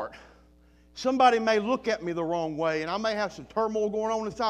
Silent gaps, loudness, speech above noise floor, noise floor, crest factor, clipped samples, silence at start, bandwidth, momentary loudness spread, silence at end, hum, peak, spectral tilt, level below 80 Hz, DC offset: none; -27 LUFS; 31 dB; -58 dBFS; 20 dB; under 0.1%; 0 s; 11 kHz; 10 LU; 0 s; none; -8 dBFS; -4.5 dB/octave; -60 dBFS; under 0.1%